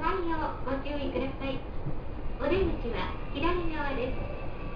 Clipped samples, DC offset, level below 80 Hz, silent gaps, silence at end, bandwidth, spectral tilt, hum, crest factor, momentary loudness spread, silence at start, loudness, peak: under 0.1%; under 0.1%; -36 dBFS; none; 0 s; 5.2 kHz; -8.5 dB/octave; none; 16 dB; 9 LU; 0 s; -33 LUFS; -16 dBFS